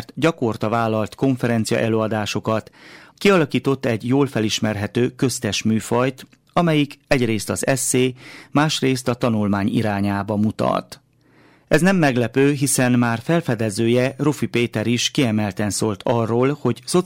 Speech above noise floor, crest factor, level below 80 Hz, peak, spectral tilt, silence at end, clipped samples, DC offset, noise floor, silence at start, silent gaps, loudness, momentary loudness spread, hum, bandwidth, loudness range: 35 dB; 14 dB; -52 dBFS; -6 dBFS; -5 dB/octave; 0 s; under 0.1%; under 0.1%; -54 dBFS; 0 s; none; -20 LUFS; 5 LU; none; 16.5 kHz; 2 LU